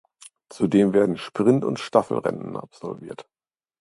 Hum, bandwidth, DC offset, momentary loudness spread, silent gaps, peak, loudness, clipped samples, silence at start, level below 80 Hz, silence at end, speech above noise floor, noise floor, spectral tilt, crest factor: none; 11.5 kHz; under 0.1%; 17 LU; none; -2 dBFS; -22 LUFS; under 0.1%; 0.5 s; -62 dBFS; 0.6 s; 27 dB; -49 dBFS; -7 dB/octave; 22 dB